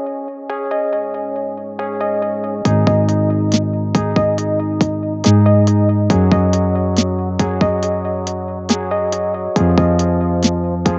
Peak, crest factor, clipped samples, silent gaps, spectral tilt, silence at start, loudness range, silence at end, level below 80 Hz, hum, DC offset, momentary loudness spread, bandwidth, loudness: 0 dBFS; 16 dB; under 0.1%; none; -7 dB/octave; 0 s; 3 LU; 0 s; -38 dBFS; none; under 0.1%; 10 LU; 8 kHz; -17 LUFS